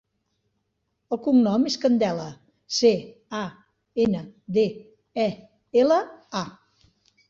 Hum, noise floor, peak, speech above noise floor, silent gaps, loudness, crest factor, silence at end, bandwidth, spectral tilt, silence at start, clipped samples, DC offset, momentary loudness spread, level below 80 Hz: none; -76 dBFS; -6 dBFS; 53 dB; none; -24 LUFS; 18 dB; 0.8 s; 7.6 kHz; -5.5 dB/octave; 1.1 s; under 0.1%; under 0.1%; 15 LU; -64 dBFS